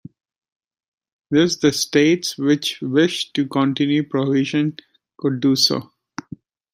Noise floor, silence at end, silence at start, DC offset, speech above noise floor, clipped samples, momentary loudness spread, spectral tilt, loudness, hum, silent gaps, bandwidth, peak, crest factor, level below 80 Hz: -41 dBFS; 0.9 s; 1.3 s; under 0.1%; 22 dB; under 0.1%; 10 LU; -4.5 dB/octave; -19 LUFS; none; none; 16 kHz; -2 dBFS; 18 dB; -64 dBFS